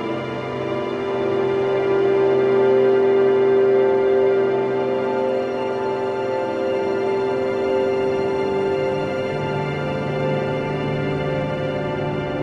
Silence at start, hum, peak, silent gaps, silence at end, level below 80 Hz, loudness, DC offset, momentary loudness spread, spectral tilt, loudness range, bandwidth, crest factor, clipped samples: 0 s; none; -6 dBFS; none; 0 s; -52 dBFS; -20 LUFS; under 0.1%; 8 LU; -7.5 dB/octave; 6 LU; 7.4 kHz; 14 dB; under 0.1%